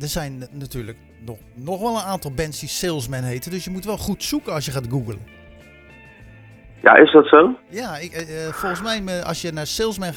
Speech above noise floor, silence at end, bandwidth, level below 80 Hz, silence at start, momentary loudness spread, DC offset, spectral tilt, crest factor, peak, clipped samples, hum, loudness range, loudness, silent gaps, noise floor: 26 dB; 0 s; 19 kHz; -44 dBFS; 0 s; 22 LU; under 0.1%; -4.5 dB/octave; 20 dB; 0 dBFS; under 0.1%; none; 11 LU; -19 LUFS; none; -45 dBFS